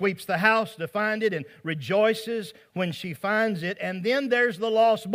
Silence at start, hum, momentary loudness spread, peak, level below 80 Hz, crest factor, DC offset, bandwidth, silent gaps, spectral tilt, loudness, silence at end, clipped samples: 0 s; none; 11 LU; -6 dBFS; -74 dBFS; 20 dB; under 0.1%; 16 kHz; none; -5.5 dB/octave; -25 LUFS; 0 s; under 0.1%